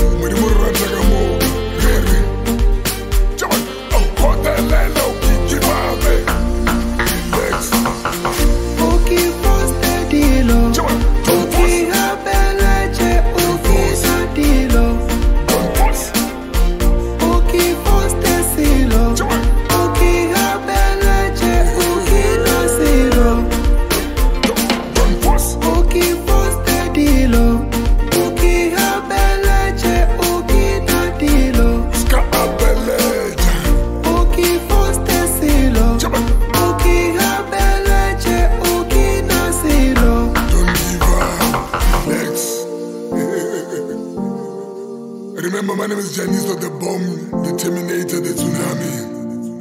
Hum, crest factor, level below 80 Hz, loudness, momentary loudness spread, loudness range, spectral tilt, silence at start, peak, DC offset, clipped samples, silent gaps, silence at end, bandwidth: none; 14 dB; -16 dBFS; -16 LUFS; 6 LU; 5 LU; -4.5 dB/octave; 0 s; 0 dBFS; under 0.1%; under 0.1%; none; 0 s; 16.5 kHz